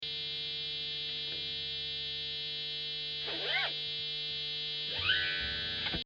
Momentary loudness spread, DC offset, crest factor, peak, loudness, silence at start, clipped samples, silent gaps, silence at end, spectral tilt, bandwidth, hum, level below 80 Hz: 5 LU; under 0.1%; 20 dB; -16 dBFS; -34 LUFS; 0 s; under 0.1%; none; 0 s; -3 dB/octave; 8.8 kHz; 50 Hz at -55 dBFS; -60 dBFS